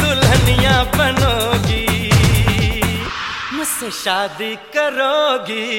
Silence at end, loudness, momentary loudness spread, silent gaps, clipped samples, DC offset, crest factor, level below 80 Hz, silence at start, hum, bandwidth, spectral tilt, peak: 0 s; -16 LUFS; 9 LU; none; under 0.1%; under 0.1%; 14 dB; -26 dBFS; 0 s; none; 17 kHz; -4.5 dB/octave; -2 dBFS